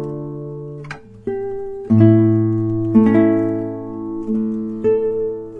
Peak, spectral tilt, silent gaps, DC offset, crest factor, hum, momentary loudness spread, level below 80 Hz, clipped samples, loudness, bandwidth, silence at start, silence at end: 0 dBFS; -11 dB/octave; none; under 0.1%; 16 dB; none; 17 LU; -48 dBFS; under 0.1%; -17 LUFS; 5 kHz; 0 s; 0 s